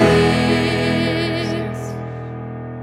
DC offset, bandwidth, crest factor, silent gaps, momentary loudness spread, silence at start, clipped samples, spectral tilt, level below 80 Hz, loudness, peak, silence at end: under 0.1%; 14.5 kHz; 18 dB; none; 15 LU; 0 s; under 0.1%; -6 dB/octave; -38 dBFS; -19 LUFS; 0 dBFS; 0 s